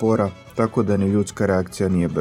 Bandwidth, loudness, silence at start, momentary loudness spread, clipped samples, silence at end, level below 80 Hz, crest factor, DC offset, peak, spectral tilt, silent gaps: 14 kHz; -21 LUFS; 0 s; 3 LU; under 0.1%; 0 s; -50 dBFS; 16 dB; under 0.1%; -4 dBFS; -7.5 dB/octave; none